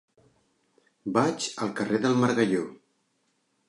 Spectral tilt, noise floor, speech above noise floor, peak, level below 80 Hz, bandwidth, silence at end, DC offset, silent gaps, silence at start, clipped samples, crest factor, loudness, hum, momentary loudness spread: -5 dB/octave; -73 dBFS; 47 dB; -8 dBFS; -72 dBFS; 11.5 kHz; 0.95 s; under 0.1%; none; 1.05 s; under 0.1%; 20 dB; -26 LUFS; none; 8 LU